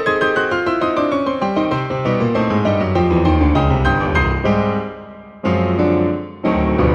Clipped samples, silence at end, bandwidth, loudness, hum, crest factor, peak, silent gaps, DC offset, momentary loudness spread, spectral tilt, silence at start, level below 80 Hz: under 0.1%; 0 s; 8.6 kHz; -17 LUFS; none; 14 dB; -2 dBFS; none; under 0.1%; 6 LU; -8 dB/octave; 0 s; -28 dBFS